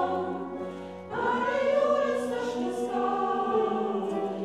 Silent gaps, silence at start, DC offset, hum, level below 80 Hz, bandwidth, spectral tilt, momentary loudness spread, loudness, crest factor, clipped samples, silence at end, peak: none; 0 s; under 0.1%; none; -74 dBFS; 12.5 kHz; -5.5 dB/octave; 11 LU; -28 LUFS; 14 dB; under 0.1%; 0 s; -14 dBFS